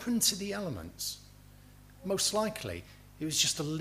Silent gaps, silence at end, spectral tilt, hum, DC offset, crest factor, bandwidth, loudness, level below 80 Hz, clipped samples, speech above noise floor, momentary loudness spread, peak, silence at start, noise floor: none; 0 s; -2.5 dB/octave; 50 Hz at -55 dBFS; under 0.1%; 22 dB; 15.5 kHz; -32 LUFS; -58 dBFS; under 0.1%; 22 dB; 14 LU; -14 dBFS; 0 s; -55 dBFS